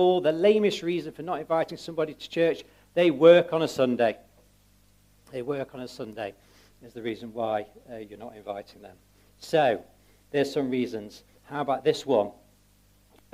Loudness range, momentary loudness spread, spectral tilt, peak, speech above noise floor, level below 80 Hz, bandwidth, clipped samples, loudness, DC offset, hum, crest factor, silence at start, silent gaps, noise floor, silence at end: 12 LU; 18 LU; -6 dB/octave; -4 dBFS; 35 dB; -64 dBFS; 15 kHz; under 0.1%; -26 LUFS; under 0.1%; 50 Hz at -60 dBFS; 22 dB; 0 s; none; -61 dBFS; 1.05 s